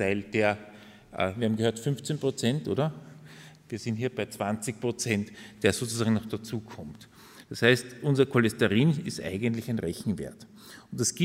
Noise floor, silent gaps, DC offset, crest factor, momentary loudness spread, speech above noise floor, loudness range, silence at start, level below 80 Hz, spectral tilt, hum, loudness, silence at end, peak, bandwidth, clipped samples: -50 dBFS; none; under 0.1%; 22 dB; 20 LU; 22 dB; 5 LU; 0 s; -62 dBFS; -5 dB/octave; none; -28 LUFS; 0 s; -6 dBFS; 16 kHz; under 0.1%